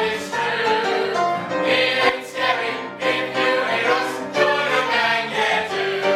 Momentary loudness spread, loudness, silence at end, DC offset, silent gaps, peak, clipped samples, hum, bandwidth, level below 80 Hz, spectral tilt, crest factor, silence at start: 5 LU; -20 LUFS; 0 s; under 0.1%; none; -4 dBFS; under 0.1%; none; 14.5 kHz; -62 dBFS; -3 dB/octave; 16 dB; 0 s